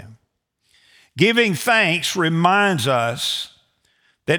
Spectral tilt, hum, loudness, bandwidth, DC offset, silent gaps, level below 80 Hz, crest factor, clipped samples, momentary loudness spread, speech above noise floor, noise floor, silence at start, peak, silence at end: -4 dB/octave; none; -18 LUFS; over 20 kHz; under 0.1%; none; -64 dBFS; 18 dB; under 0.1%; 12 LU; 52 dB; -70 dBFS; 0 s; -2 dBFS; 0 s